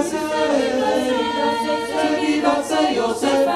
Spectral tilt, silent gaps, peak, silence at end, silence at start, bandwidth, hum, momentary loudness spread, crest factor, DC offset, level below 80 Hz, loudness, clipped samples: -3.5 dB/octave; none; -4 dBFS; 0 s; 0 s; 14.5 kHz; none; 2 LU; 14 dB; under 0.1%; -54 dBFS; -19 LUFS; under 0.1%